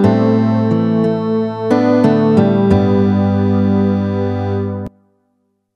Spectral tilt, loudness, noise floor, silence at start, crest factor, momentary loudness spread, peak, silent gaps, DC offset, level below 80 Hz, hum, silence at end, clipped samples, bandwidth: -9.5 dB/octave; -14 LUFS; -65 dBFS; 0 s; 14 dB; 7 LU; 0 dBFS; none; under 0.1%; -46 dBFS; none; 0.9 s; under 0.1%; 6.6 kHz